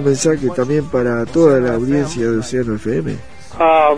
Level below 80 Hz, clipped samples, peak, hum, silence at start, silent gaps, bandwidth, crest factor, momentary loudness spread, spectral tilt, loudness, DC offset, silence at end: -42 dBFS; under 0.1%; 0 dBFS; none; 0 s; none; 10.5 kHz; 14 dB; 8 LU; -6 dB/octave; -16 LUFS; 2%; 0 s